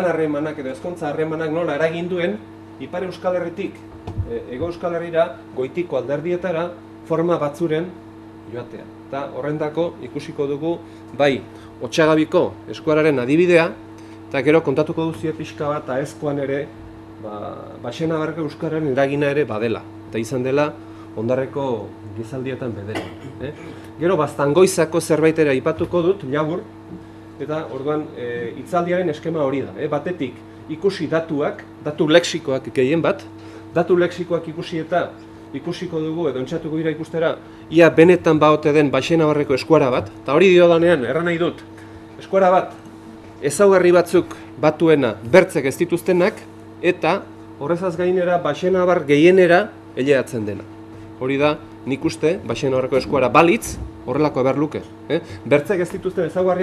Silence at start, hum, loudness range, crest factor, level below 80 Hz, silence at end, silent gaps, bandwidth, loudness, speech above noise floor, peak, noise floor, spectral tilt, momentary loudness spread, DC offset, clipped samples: 0 s; none; 8 LU; 20 dB; -52 dBFS; 0 s; none; 13.5 kHz; -19 LUFS; 20 dB; 0 dBFS; -39 dBFS; -6 dB/octave; 18 LU; under 0.1%; under 0.1%